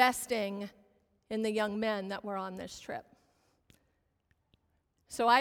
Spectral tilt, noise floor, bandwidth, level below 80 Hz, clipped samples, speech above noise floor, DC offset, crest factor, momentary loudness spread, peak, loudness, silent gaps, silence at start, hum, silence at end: -3.5 dB/octave; -76 dBFS; 18.5 kHz; -70 dBFS; under 0.1%; 44 dB; under 0.1%; 24 dB; 14 LU; -10 dBFS; -35 LUFS; none; 0 s; none; 0 s